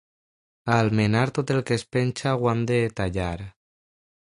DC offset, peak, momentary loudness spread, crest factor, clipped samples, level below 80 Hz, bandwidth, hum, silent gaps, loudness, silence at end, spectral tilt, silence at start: under 0.1%; -4 dBFS; 10 LU; 20 dB; under 0.1%; -46 dBFS; 11 kHz; none; none; -24 LUFS; 0.8 s; -6.5 dB/octave; 0.65 s